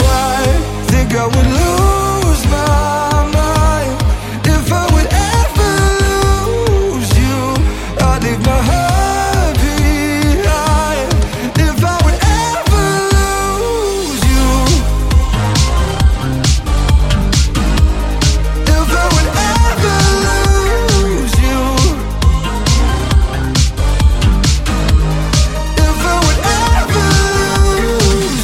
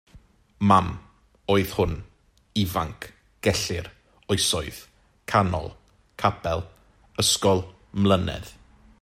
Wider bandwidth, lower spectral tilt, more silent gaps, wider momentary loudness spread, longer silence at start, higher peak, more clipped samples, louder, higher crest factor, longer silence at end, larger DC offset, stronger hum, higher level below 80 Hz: about the same, 16.5 kHz vs 16 kHz; about the same, -5 dB/octave vs -4.5 dB/octave; neither; second, 3 LU vs 20 LU; second, 0 s vs 0.15 s; first, 0 dBFS vs -4 dBFS; neither; first, -13 LUFS vs -24 LUFS; second, 12 dB vs 22 dB; second, 0 s vs 0.5 s; neither; neither; first, -14 dBFS vs -48 dBFS